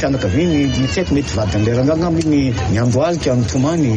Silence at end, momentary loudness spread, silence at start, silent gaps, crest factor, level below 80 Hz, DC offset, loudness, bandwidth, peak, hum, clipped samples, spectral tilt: 0 s; 2 LU; 0 s; none; 10 dB; -32 dBFS; under 0.1%; -16 LUFS; 9.6 kHz; -4 dBFS; none; under 0.1%; -6.5 dB/octave